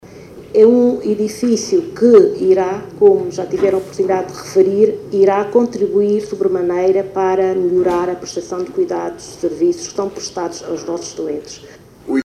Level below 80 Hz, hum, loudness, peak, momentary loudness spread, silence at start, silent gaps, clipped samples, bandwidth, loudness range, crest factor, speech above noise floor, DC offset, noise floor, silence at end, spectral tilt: -52 dBFS; none; -16 LUFS; 0 dBFS; 13 LU; 0.05 s; none; under 0.1%; 12.5 kHz; 8 LU; 16 dB; 21 dB; under 0.1%; -36 dBFS; 0 s; -5.5 dB/octave